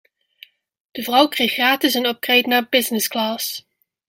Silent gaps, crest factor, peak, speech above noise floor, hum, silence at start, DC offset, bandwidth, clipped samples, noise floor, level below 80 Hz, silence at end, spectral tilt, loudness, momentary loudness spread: none; 20 dB; -2 dBFS; 30 dB; none; 0.95 s; under 0.1%; 16.5 kHz; under 0.1%; -49 dBFS; -68 dBFS; 0.5 s; -1.5 dB/octave; -18 LUFS; 11 LU